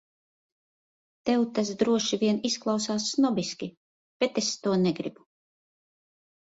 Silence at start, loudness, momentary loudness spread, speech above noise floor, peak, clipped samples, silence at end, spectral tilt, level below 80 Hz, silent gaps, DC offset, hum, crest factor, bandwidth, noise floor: 1.25 s; -27 LUFS; 10 LU; over 64 dB; -10 dBFS; under 0.1%; 1.4 s; -4.5 dB/octave; -68 dBFS; 3.77-4.20 s; under 0.1%; none; 20 dB; 8 kHz; under -90 dBFS